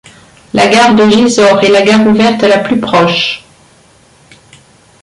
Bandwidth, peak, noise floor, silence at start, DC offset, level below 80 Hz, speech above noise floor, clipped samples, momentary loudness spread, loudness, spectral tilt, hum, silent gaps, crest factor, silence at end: 11.5 kHz; 0 dBFS; -44 dBFS; 0.55 s; under 0.1%; -46 dBFS; 37 dB; under 0.1%; 7 LU; -8 LUFS; -4.5 dB/octave; none; none; 10 dB; 1.65 s